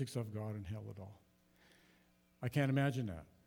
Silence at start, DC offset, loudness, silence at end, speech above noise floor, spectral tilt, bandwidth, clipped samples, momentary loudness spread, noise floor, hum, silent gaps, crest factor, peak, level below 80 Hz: 0 s; under 0.1%; -39 LUFS; 0.2 s; 32 dB; -7 dB/octave; 17 kHz; under 0.1%; 17 LU; -71 dBFS; 60 Hz at -70 dBFS; none; 20 dB; -22 dBFS; -70 dBFS